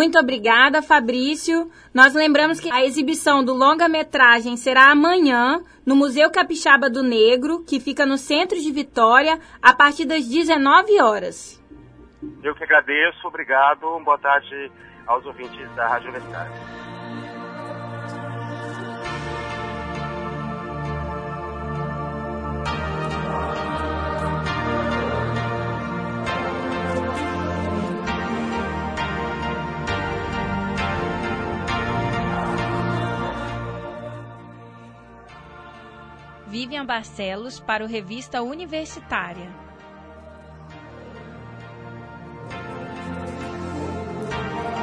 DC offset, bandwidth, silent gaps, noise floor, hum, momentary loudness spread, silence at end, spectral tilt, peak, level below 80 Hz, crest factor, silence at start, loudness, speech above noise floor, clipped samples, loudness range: under 0.1%; 11 kHz; none; -45 dBFS; none; 20 LU; 0 s; -4.5 dB/octave; 0 dBFS; -42 dBFS; 22 dB; 0 s; -20 LUFS; 27 dB; under 0.1%; 17 LU